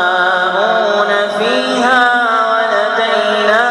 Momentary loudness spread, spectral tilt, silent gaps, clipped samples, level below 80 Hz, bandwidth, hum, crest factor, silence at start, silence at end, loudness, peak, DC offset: 3 LU; -3 dB/octave; none; under 0.1%; -60 dBFS; 11.5 kHz; none; 12 dB; 0 s; 0 s; -12 LUFS; 0 dBFS; under 0.1%